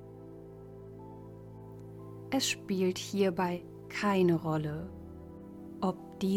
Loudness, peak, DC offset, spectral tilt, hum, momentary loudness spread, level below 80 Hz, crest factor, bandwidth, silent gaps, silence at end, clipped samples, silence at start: -32 LUFS; -18 dBFS; under 0.1%; -5 dB/octave; none; 21 LU; -60 dBFS; 16 dB; 17 kHz; none; 0 s; under 0.1%; 0 s